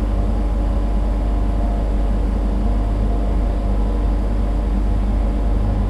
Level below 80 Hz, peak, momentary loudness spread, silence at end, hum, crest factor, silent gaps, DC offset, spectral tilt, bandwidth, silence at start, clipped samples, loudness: -18 dBFS; -8 dBFS; 1 LU; 0 s; none; 10 dB; none; under 0.1%; -8.5 dB/octave; 5.2 kHz; 0 s; under 0.1%; -21 LUFS